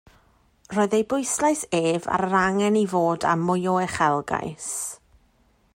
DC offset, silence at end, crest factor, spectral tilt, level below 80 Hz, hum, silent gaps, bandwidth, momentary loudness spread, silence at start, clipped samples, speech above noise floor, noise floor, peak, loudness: under 0.1%; 0.8 s; 16 dB; -4.5 dB/octave; -58 dBFS; none; none; 16 kHz; 8 LU; 0.7 s; under 0.1%; 39 dB; -62 dBFS; -8 dBFS; -23 LUFS